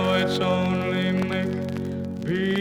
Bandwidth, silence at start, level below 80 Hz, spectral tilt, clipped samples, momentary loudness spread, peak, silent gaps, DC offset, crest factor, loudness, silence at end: 13.5 kHz; 0 s; -54 dBFS; -6.5 dB/octave; under 0.1%; 7 LU; -10 dBFS; none; under 0.1%; 14 dB; -25 LUFS; 0 s